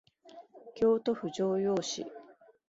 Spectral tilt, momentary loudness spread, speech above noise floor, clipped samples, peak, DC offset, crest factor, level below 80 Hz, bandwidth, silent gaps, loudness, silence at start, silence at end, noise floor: -5 dB/octave; 23 LU; 25 dB; under 0.1%; -18 dBFS; under 0.1%; 16 dB; -72 dBFS; 7.8 kHz; none; -31 LUFS; 0.25 s; 0.4 s; -55 dBFS